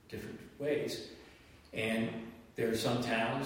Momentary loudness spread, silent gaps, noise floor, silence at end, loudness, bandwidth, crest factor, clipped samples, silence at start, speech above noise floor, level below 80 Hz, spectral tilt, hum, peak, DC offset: 16 LU; none; -58 dBFS; 0 s; -36 LUFS; 16 kHz; 16 dB; under 0.1%; 0.1 s; 23 dB; -64 dBFS; -5 dB/octave; none; -20 dBFS; under 0.1%